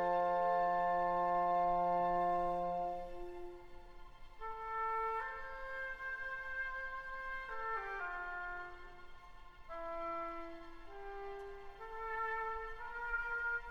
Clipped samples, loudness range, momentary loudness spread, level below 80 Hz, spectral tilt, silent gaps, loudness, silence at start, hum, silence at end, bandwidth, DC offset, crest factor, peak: under 0.1%; 11 LU; 18 LU; -56 dBFS; -6.5 dB/octave; none; -39 LUFS; 0 s; none; 0 s; 7.6 kHz; under 0.1%; 16 dB; -24 dBFS